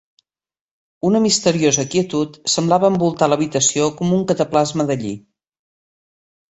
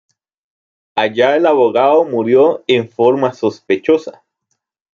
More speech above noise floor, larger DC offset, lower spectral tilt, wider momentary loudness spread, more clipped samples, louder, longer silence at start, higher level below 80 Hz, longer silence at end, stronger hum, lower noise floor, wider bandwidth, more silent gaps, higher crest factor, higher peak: first, over 73 dB vs 58 dB; neither; second, -4.5 dB/octave vs -6.5 dB/octave; about the same, 7 LU vs 7 LU; neither; second, -17 LUFS vs -14 LUFS; about the same, 1.05 s vs 0.95 s; first, -56 dBFS vs -64 dBFS; first, 1.3 s vs 0.85 s; neither; first, under -90 dBFS vs -71 dBFS; first, 8.2 kHz vs 7.2 kHz; neither; about the same, 18 dB vs 14 dB; about the same, -2 dBFS vs -2 dBFS